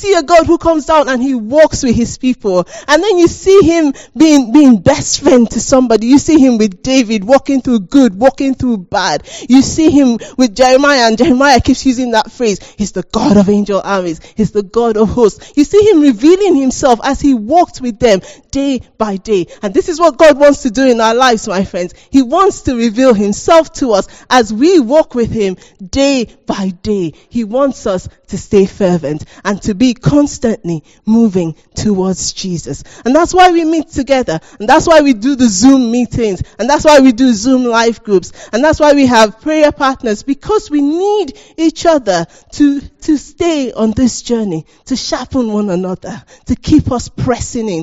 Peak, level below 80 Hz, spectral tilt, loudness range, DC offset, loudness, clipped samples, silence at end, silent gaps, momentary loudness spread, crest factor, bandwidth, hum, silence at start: 0 dBFS; -36 dBFS; -5 dB/octave; 6 LU; under 0.1%; -11 LUFS; 1%; 0 s; none; 11 LU; 10 dB; 9 kHz; none; 0 s